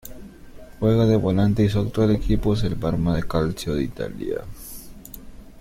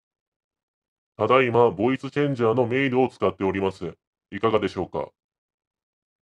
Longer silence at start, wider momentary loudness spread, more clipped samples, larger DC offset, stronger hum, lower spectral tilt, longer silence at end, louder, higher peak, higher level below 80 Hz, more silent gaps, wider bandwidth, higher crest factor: second, 0.05 s vs 1.2 s; first, 21 LU vs 13 LU; neither; neither; neither; about the same, -7.5 dB/octave vs -7.5 dB/octave; second, 0.05 s vs 1.2 s; about the same, -22 LUFS vs -23 LUFS; about the same, -6 dBFS vs -4 dBFS; first, -36 dBFS vs -62 dBFS; second, none vs 4.07-4.13 s; first, 16.5 kHz vs 9.8 kHz; about the same, 16 dB vs 20 dB